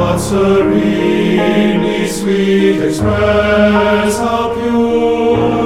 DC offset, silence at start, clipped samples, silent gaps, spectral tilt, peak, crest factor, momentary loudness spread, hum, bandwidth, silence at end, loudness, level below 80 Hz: under 0.1%; 0 s; under 0.1%; none; -6 dB/octave; 0 dBFS; 12 dB; 4 LU; none; 15.5 kHz; 0 s; -12 LUFS; -32 dBFS